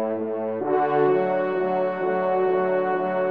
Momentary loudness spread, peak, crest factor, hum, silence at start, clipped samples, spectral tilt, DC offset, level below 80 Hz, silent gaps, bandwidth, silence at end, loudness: 6 LU; -10 dBFS; 14 dB; none; 0 s; under 0.1%; -9.5 dB/octave; 0.2%; -76 dBFS; none; 4.7 kHz; 0 s; -23 LUFS